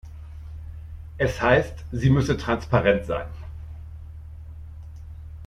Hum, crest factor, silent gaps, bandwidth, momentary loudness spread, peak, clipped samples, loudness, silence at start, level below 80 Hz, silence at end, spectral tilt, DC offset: none; 20 dB; none; 11.5 kHz; 21 LU; -6 dBFS; under 0.1%; -23 LUFS; 0.05 s; -40 dBFS; 0 s; -7 dB/octave; under 0.1%